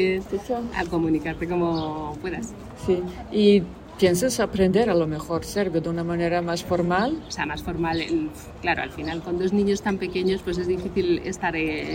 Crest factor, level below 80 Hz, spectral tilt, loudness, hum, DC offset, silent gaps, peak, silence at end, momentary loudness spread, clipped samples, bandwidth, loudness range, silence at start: 18 dB; -44 dBFS; -5.5 dB/octave; -24 LUFS; none; under 0.1%; none; -6 dBFS; 0 s; 9 LU; under 0.1%; 16 kHz; 4 LU; 0 s